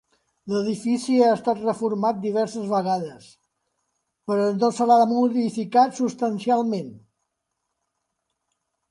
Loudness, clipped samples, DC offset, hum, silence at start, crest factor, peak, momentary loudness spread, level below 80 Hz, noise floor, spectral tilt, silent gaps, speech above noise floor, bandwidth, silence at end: -22 LUFS; under 0.1%; under 0.1%; none; 0.45 s; 18 dB; -6 dBFS; 10 LU; -72 dBFS; -79 dBFS; -6 dB/octave; none; 58 dB; 11.5 kHz; 1.95 s